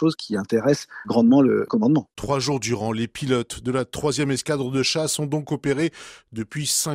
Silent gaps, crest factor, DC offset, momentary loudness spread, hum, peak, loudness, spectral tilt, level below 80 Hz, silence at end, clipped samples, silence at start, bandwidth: none; 16 dB; under 0.1%; 9 LU; none; -6 dBFS; -22 LUFS; -4.5 dB/octave; -54 dBFS; 0 s; under 0.1%; 0 s; 15.5 kHz